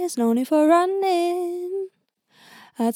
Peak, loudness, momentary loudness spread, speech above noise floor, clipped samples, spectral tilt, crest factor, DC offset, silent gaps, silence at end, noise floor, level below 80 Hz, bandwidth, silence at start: -6 dBFS; -21 LUFS; 13 LU; 44 dB; under 0.1%; -4.5 dB/octave; 16 dB; under 0.1%; none; 0 s; -64 dBFS; -84 dBFS; 17 kHz; 0 s